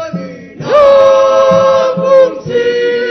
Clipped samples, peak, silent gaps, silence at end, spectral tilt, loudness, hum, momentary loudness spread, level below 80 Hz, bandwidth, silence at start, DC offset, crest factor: 0.7%; 0 dBFS; none; 0 s; -5 dB/octave; -8 LUFS; none; 16 LU; -48 dBFS; 6.4 kHz; 0 s; under 0.1%; 8 dB